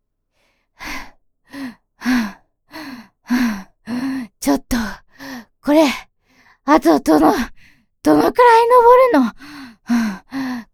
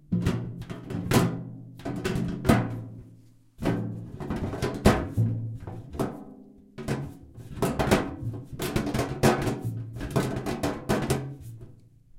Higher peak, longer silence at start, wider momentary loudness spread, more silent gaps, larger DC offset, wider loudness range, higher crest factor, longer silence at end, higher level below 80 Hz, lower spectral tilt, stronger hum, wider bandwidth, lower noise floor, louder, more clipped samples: first, 0 dBFS vs -4 dBFS; first, 0.8 s vs 0.1 s; first, 23 LU vs 17 LU; neither; neither; first, 11 LU vs 3 LU; second, 18 dB vs 24 dB; about the same, 0.1 s vs 0 s; about the same, -44 dBFS vs -42 dBFS; second, -4.5 dB/octave vs -6 dB/octave; neither; first, 18.5 kHz vs 16.5 kHz; first, -66 dBFS vs -53 dBFS; first, -15 LUFS vs -29 LUFS; neither